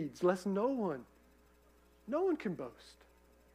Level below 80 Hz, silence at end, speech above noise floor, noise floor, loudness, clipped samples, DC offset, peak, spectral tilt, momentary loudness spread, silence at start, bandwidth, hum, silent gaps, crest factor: -70 dBFS; 0.6 s; 30 dB; -66 dBFS; -36 LUFS; under 0.1%; under 0.1%; -20 dBFS; -7 dB/octave; 15 LU; 0 s; 15.5 kHz; 60 Hz at -70 dBFS; none; 18 dB